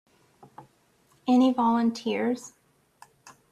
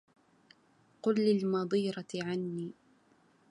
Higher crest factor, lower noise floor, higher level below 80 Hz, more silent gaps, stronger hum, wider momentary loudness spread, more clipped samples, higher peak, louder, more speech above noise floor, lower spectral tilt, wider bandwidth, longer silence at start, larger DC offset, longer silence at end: about the same, 16 dB vs 18 dB; about the same, -64 dBFS vs -67 dBFS; first, -72 dBFS vs -80 dBFS; neither; neither; first, 14 LU vs 11 LU; neither; first, -12 dBFS vs -18 dBFS; first, -25 LUFS vs -33 LUFS; first, 41 dB vs 36 dB; second, -5.5 dB/octave vs -7 dB/octave; about the same, 11 kHz vs 11 kHz; second, 0.6 s vs 1.05 s; neither; first, 1.05 s vs 0.8 s